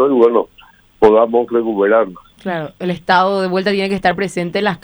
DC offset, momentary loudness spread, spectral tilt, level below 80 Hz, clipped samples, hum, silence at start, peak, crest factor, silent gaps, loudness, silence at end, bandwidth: under 0.1%; 12 LU; -6 dB/octave; -50 dBFS; under 0.1%; none; 0 s; 0 dBFS; 14 dB; none; -15 LUFS; 0.05 s; over 20 kHz